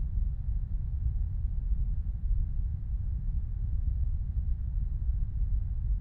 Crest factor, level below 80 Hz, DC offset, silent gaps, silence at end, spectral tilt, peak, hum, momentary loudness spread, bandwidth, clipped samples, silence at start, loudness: 12 dB; -30 dBFS; under 0.1%; none; 0 s; -12 dB/octave; -18 dBFS; none; 2 LU; 1.2 kHz; under 0.1%; 0 s; -35 LUFS